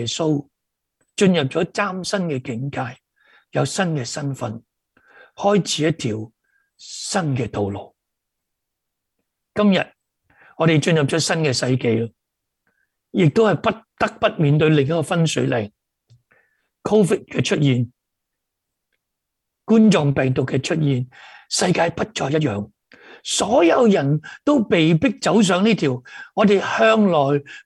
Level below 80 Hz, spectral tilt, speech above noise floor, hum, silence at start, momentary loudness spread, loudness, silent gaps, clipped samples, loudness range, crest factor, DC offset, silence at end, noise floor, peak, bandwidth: -56 dBFS; -5.5 dB/octave; 61 dB; none; 0 s; 14 LU; -19 LUFS; none; under 0.1%; 7 LU; 18 dB; under 0.1%; 0.05 s; -80 dBFS; -4 dBFS; 12 kHz